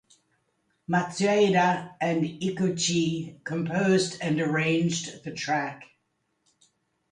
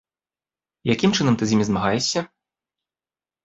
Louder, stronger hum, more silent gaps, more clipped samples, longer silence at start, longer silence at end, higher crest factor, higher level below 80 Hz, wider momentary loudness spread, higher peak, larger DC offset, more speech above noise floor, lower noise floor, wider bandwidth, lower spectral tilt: second, -26 LUFS vs -21 LUFS; neither; neither; neither; about the same, 0.9 s vs 0.85 s; about the same, 1.25 s vs 1.2 s; about the same, 16 dB vs 20 dB; second, -68 dBFS vs -54 dBFS; first, 12 LU vs 9 LU; second, -10 dBFS vs -4 dBFS; neither; second, 50 dB vs over 70 dB; second, -75 dBFS vs under -90 dBFS; first, 10.5 kHz vs 8 kHz; about the same, -5 dB/octave vs -5 dB/octave